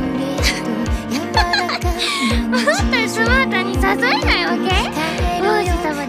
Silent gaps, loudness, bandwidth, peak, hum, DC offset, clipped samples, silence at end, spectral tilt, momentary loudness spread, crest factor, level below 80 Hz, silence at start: none; -17 LUFS; 16 kHz; -4 dBFS; none; under 0.1%; under 0.1%; 0 s; -4.5 dB/octave; 5 LU; 14 dB; -26 dBFS; 0 s